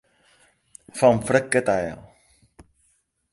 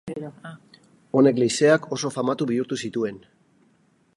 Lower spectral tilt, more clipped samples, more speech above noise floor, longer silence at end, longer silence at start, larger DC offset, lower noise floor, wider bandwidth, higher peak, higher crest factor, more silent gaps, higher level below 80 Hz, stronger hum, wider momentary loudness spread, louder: about the same, -5 dB/octave vs -5 dB/octave; neither; first, 47 dB vs 40 dB; first, 1.3 s vs 1 s; first, 0.95 s vs 0.05 s; neither; first, -68 dBFS vs -62 dBFS; about the same, 11.5 kHz vs 11.5 kHz; about the same, -2 dBFS vs -4 dBFS; about the same, 22 dB vs 20 dB; neither; first, -56 dBFS vs -68 dBFS; neither; about the same, 18 LU vs 18 LU; about the same, -21 LUFS vs -22 LUFS